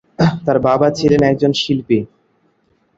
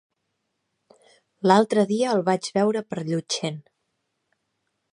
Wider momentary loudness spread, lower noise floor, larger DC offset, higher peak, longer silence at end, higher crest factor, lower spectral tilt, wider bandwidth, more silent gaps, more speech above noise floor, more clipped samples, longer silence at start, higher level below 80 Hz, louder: second, 6 LU vs 10 LU; second, -60 dBFS vs -77 dBFS; neither; about the same, -2 dBFS vs -2 dBFS; second, 0.9 s vs 1.3 s; second, 14 dB vs 24 dB; first, -6.5 dB/octave vs -5 dB/octave; second, 7.8 kHz vs 11 kHz; neither; second, 46 dB vs 55 dB; neither; second, 0.2 s vs 1.45 s; first, -46 dBFS vs -74 dBFS; first, -15 LUFS vs -23 LUFS